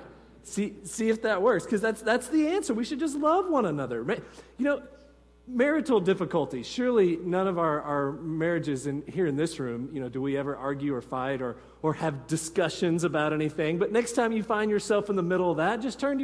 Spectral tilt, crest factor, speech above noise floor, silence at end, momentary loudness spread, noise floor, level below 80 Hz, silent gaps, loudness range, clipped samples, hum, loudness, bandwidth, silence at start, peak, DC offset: -5.5 dB/octave; 16 dB; 22 dB; 0 s; 8 LU; -49 dBFS; -60 dBFS; none; 4 LU; under 0.1%; none; -28 LUFS; 11 kHz; 0 s; -12 dBFS; under 0.1%